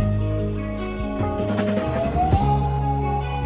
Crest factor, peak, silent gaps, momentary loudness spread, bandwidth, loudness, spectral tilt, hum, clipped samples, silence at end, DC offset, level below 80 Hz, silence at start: 16 dB; -6 dBFS; none; 8 LU; 4 kHz; -23 LUFS; -12 dB/octave; none; under 0.1%; 0 s; under 0.1%; -30 dBFS; 0 s